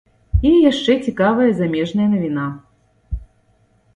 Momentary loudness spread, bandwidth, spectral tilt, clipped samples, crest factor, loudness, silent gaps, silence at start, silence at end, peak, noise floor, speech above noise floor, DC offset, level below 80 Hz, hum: 19 LU; 10.5 kHz; -7 dB/octave; under 0.1%; 16 dB; -17 LUFS; none; 0.35 s; 0.7 s; -2 dBFS; -58 dBFS; 42 dB; under 0.1%; -30 dBFS; none